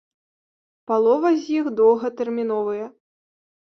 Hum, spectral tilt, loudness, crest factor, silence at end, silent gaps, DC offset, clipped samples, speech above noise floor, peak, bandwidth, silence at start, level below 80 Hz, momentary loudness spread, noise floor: none; -6.5 dB/octave; -21 LUFS; 16 dB; 0.8 s; none; under 0.1%; under 0.1%; over 70 dB; -6 dBFS; 6.4 kHz; 0.9 s; -70 dBFS; 9 LU; under -90 dBFS